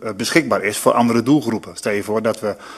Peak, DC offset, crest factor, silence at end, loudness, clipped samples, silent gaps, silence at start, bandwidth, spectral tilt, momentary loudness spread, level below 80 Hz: 0 dBFS; under 0.1%; 18 dB; 0 s; -18 LUFS; under 0.1%; none; 0 s; 14 kHz; -4.5 dB/octave; 8 LU; -58 dBFS